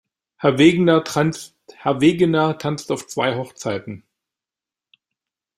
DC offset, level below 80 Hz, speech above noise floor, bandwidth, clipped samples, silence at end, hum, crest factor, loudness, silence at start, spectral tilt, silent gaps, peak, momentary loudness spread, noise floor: under 0.1%; -58 dBFS; 71 dB; 13.5 kHz; under 0.1%; 1.6 s; none; 20 dB; -19 LUFS; 0.4 s; -6 dB/octave; none; -2 dBFS; 16 LU; -89 dBFS